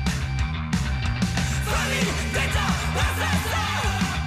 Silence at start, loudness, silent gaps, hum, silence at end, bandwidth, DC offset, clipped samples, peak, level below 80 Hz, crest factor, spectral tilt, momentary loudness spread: 0 s; -24 LUFS; none; none; 0 s; 16 kHz; under 0.1%; under 0.1%; -12 dBFS; -30 dBFS; 12 dB; -4.5 dB/octave; 3 LU